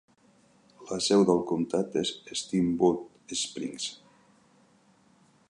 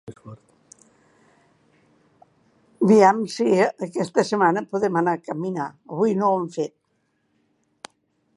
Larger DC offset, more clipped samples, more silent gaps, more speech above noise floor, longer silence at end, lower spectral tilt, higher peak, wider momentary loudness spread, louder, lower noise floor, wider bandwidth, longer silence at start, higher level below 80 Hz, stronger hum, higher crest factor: neither; neither; neither; second, 35 dB vs 50 dB; second, 1.55 s vs 1.7 s; second, -4.5 dB/octave vs -6 dB/octave; second, -10 dBFS vs -2 dBFS; about the same, 13 LU vs 14 LU; second, -28 LUFS vs -21 LUFS; second, -63 dBFS vs -70 dBFS; about the same, 11.5 kHz vs 11.5 kHz; first, 0.8 s vs 0.05 s; first, -64 dBFS vs -72 dBFS; neither; about the same, 20 dB vs 22 dB